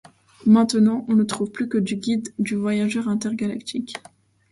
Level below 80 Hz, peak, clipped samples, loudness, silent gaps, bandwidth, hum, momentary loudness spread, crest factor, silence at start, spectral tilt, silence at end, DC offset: -64 dBFS; -6 dBFS; under 0.1%; -22 LUFS; none; 11.5 kHz; none; 12 LU; 16 dB; 0.45 s; -5.5 dB/octave; 0.55 s; under 0.1%